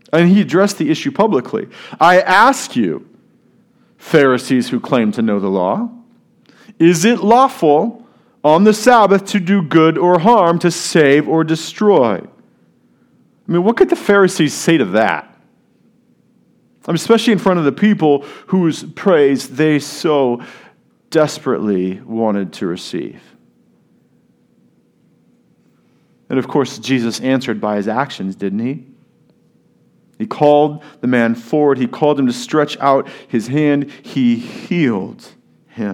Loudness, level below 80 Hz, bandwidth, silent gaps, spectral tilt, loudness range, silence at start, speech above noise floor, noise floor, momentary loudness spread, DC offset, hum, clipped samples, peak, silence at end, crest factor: -14 LUFS; -60 dBFS; 16 kHz; none; -5.5 dB/octave; 9 LU; 0.15 s; 41 dB; -55 dBFS; 11 LU; under 0.1%; none; under 0.1%; 0 dBFS; 0 s; 16 dB